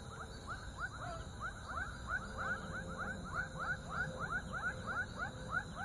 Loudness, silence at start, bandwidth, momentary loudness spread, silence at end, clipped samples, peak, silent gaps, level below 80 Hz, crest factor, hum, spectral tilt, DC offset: -42 LUFS; 0 s; 11.5 kHz; 6 LU; 0 s; under 0.1%; -26 dBFS; none; -54 dBFS; 16 dB; none; -4.5 dB/octave; under 0.1%